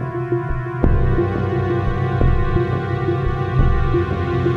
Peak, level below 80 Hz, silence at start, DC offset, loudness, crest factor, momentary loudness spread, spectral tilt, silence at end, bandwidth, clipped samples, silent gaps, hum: -2 dBFS; -22 dBFS; 0 s; under 0.1%; -20 LUFS; 16 dB; 4 LU; -9.5 dB/octave; 0 s; 5.8 kHz; under 0.1%; none; none